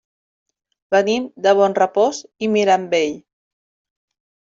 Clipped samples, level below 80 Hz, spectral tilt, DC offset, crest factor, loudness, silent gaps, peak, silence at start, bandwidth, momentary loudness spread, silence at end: under 0.1%; -66 dBFS; -4.5 dB/octave; under 0.1%; 18 dB; -18 LUFS; none; -2 dBFS; 0.9 s; 7.6 kHz; 8 LU; 1.35 s